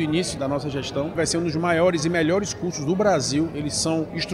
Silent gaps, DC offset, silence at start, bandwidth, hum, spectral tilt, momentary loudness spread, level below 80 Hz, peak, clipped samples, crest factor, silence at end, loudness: none; under 0.1%; 0 s; 13.5 kHz; none; -4.5 dB/octave; 7 LU; -48 dBFS; -8 dBFS; under 0.1%; 16 dB; 0 s; -23 LUFS